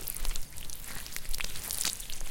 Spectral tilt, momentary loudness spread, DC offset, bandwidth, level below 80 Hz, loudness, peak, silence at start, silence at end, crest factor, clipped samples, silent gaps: -0.5 dB/octave; 9 LU; under 0.1%; 17 kHz; -38 dBFS; -36 LUFS; -8 dBFS; 0 s; 0 s; 24 dB; under 0.1%; none